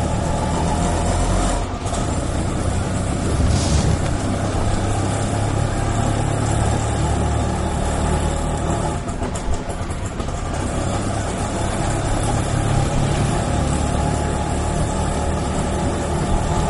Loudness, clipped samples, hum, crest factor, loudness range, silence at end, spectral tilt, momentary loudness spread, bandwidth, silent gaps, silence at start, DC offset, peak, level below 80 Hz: -21 LUFS; under 0.1%; none; 14 dB; 3 LU; 0 s; -5.5 dB/octave; 4 LU; 11.5 kHz; none; 0 s; under 0.1%; -4 dBFS; -24 dBFS